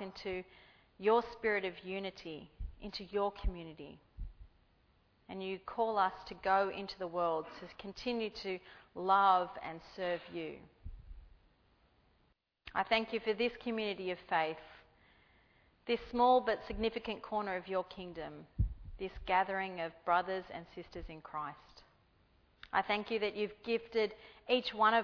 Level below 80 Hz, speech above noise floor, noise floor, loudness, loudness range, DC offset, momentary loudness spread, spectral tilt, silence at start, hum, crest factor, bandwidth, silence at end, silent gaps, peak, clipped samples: -52 dBFS; 39 dB; -75 dBFS; -36 LUFS; 6 LU; under 0.1%; 17 LU; -6 dB/octave; 0 s; none; 22 dB; 5.4 kHz; 0 s; none; -16 dBFS; under 0.1%